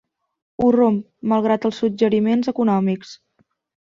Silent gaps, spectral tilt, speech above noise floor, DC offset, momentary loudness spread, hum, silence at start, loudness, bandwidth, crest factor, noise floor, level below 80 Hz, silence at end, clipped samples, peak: none; -7.5 dB/octave; 47 dB; under 0.1%; 7 LU; none; 0.6 s; -19 LUFS; 7.2 kHz; 14 dB; -65 dBFS; -58 dBFS; 0.8 s; under 0.1%; -6 dBFS